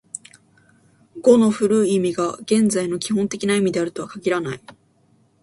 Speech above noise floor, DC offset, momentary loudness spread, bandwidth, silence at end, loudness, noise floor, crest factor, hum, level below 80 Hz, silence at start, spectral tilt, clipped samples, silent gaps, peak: 40 dB; under 0.1%; 12 LU; 11.5 kHz; 0.7 s; -20 LUFS; -59 dBFS; 20 dB; none; -62 dBFS; 1.15 s; -5 dB/octave; under 0.1%; none; -2 dBFS